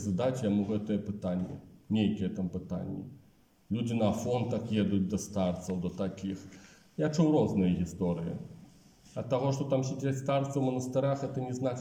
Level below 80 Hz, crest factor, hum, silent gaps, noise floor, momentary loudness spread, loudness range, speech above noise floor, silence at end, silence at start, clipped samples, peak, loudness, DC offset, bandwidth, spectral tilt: -64 dBFS; 16 dB; none; none; -63 dBFS; 12 LU; 3 LU; 32 dB; 0 s; 0 s; under 0.1%; -16 dBFS; -32 LUFS; under 0.1%; 15.5 kHz; -7 dB/octave